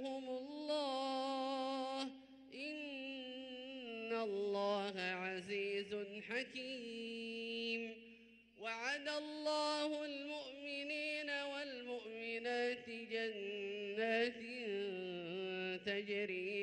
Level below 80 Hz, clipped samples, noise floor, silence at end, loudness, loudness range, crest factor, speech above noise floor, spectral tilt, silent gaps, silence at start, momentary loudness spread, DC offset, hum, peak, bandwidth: -84 dBFS; under 0.1%; -64 dBFS; 0 s; -43 LUFS; 3 LU; 18 dB; 22 dB; -4 dB/octave; none; 0 s; 8 LU; under 0.1%; none; -26 dBFS; 11 kHz